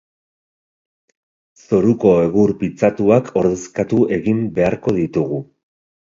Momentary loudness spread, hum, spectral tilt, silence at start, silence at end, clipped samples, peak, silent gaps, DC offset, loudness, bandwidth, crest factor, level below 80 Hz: 6 LU; none; -8 dB/octave; 1.7 s; 0.7 s; under 0.1%; 0 dBFS; none; under 0.1%; -17 LUFS; 7.6 kHz; 18 dB; -48 dBFS